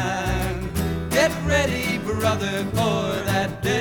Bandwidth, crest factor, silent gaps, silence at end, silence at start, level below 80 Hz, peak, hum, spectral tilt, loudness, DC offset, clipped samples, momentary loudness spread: over 20 kHz; 16 dB; none; 0 s; 0 s; -36 dBFS; -6 dBFS; none; -5 dB/octave; -23 LUFS; under 0.1%; under 0.1%; 5 LU